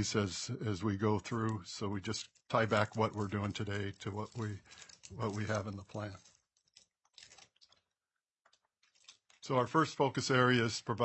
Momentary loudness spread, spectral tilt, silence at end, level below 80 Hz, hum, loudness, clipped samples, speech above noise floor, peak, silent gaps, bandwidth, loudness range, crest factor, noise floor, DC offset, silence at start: 14 LU; -5 dB/octave; 0 s; -72 dBFS; none; -35 LUFS; under 0.1%; over 55 dB; -14 dBFS; none; 8.4 kHz; 10 LU; 22 dB; under -90 dBFS; under 0.1%; 0 s